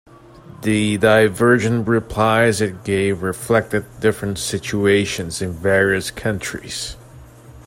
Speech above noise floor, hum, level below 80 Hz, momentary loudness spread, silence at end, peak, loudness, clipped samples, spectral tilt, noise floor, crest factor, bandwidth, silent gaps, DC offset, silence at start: 24 dB; none; -46 dBFS; 11 LU; 0.05 s; -2 dBFS; -18 LUFS; under 0.1%; -5 dB/octave; -42 dBFS; 18 dB; 16 kHz; none; under 0.1%; 0.45 s